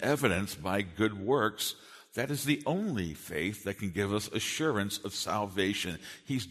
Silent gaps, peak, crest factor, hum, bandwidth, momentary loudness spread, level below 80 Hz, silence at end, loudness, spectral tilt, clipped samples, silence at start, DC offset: none; -12 dBFS; 22 dB; none; 13.5 kHz; 8 LU; -60 dBFS; 0 s; -32 LUFS; -4.5 dB/octave; under 0.1%; 0 s; under 0.1%